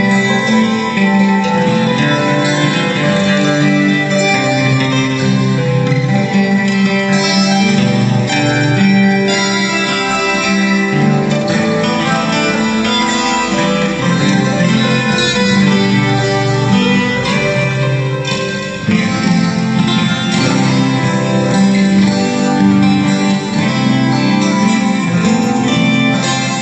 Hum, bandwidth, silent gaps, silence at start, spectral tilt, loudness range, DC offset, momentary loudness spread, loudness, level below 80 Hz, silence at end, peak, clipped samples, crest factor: none; 9 kHz; none; 0 s; -5.5 dB/octave; 2 LU; under 0.1%; 3 LU; -12 LUFS; -46 dBFS; 0 s; 0 dBFS; under 0.1%; 12 dB